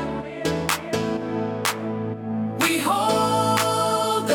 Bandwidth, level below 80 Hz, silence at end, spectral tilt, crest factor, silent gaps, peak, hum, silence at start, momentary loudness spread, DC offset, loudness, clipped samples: 18 kHz; -54 dBFS; 0 s; -4 dB/octave; 20 dB; none; -4 dBFS; none; 0 s; 8 LU; under 0.1%; -23 LUFS; under 0.1%